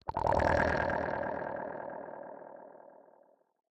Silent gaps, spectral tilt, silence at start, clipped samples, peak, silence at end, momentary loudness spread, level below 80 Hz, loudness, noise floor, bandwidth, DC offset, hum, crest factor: none; -7 dB/octave; 0.05 s; under 0.1%; -14 dBFS; 0.8 s; 22 LU; -52 dBFS; -33 LUFS; -66 dBFS; 9 kHz; under 0.1%; none; 22 dB